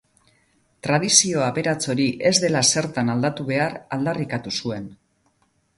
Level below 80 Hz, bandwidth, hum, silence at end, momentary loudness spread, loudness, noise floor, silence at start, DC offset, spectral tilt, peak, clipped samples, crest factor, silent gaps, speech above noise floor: -58 dBFS; 11.5 kHz; none; 0.85 s; 11 LU; -21 LUFS; -66 dBFS; 0.85 s; under 0.1%; -3 dB/octave; 0 dBFS; under 0.1%; 22 dB; none; 44 dB